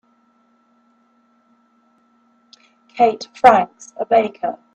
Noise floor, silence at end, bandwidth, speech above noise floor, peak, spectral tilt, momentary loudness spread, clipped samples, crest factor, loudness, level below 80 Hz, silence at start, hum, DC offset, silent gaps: -59 dBFS; 0.2 s; 8.4 kHz; 43 dB; 0 dBFS; -4.5 dB/octave; 16 LU; under 0.1%; 20 dB; -17 LUFS; -62 dBFS; 2.95 s; none; under 0.1%; none